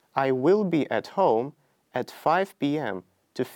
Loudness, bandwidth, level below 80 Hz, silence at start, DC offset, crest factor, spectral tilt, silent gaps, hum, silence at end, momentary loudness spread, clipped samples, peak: -25 LUFS; 17.5 kHz; -76 dBFS; 0.15 s; under 0.1%; 18 dB; -7 dB/octave; none; none; 0 s; 13 LU; under 0.1%; -8 dBFS